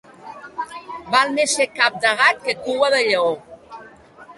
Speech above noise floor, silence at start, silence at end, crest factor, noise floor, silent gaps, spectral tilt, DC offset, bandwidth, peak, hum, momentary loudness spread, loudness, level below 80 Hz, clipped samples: 26 dB; 0.25 s; 0.05 s; 20 dB; -44 dBFS; none; -1 dB/octave; under 0.1%; 11.5 kHz; 0 dBFS; none; 18 LU; -18 LUFS; -64 dBFS; under 0.1%